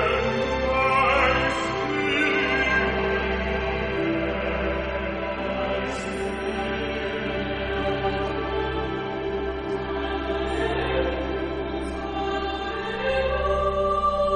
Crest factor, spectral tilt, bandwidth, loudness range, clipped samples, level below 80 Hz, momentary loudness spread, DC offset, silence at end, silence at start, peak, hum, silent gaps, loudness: 18 dB; -5.5 dB/octave; 11 kHz; 5 LU; under 0.1%; -36 dBFS; 8 LU; under 0.1%; 0 s; 0 s; -8 dBFS; none; none; -25 LUFS